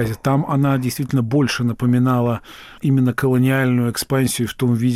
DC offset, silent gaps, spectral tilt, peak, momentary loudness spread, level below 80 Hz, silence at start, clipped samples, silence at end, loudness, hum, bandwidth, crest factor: under 0.1%; none; -6.5 dB/octave; -8 dBFS; 4 LU; -48 dBFS; 0 s; under 0.1%; 0 s; -18 LUFS; none; 16 kHz; 10 dB